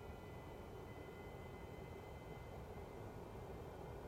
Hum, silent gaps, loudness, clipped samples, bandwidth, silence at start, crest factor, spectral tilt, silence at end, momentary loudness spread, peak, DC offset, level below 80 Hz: none; none; -54 LUFS; under 0.1%; 16 kHz; 0 s; 12 dB; -6.5 dB/octave; 0 s; 1 LU; -40 dBFS; under 0.1%; -62 dBFS